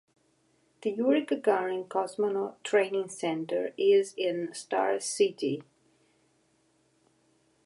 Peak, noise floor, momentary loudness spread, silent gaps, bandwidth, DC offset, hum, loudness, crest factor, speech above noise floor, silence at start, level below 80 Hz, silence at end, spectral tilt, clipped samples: -12 dBFS; -69 dBFS; 9 LU; none; 11.5 kHz; under 0.1%; none; -29 LUFS; 18 dB; 41 dB; 0.85 s; -86 dBFS; 2.05 s; -4 dB/octave; under 0.1%